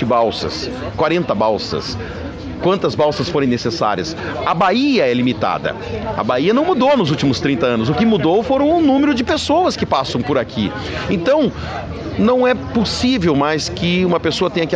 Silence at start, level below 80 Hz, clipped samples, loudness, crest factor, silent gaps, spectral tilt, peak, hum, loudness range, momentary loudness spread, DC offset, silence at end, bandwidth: 0 s; -40 dBFS; under 0.1%; -17 LUFS; 14 dB; none; -6 dB/octave; -2 dBFS; none; 3 LU; 9 LU; under 0.1%; 0 s; 9.6 kHz